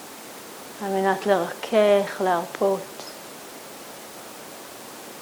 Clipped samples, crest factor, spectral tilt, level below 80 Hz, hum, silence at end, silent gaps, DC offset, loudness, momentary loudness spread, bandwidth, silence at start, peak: under 0.1%; 20 dB; -4.5 dB/octave; -72 dBFS; none; 0 s; none; under 0.1%; -23 LUFS; 18 LU; over 20 kHz; 0 s; -6 dBFS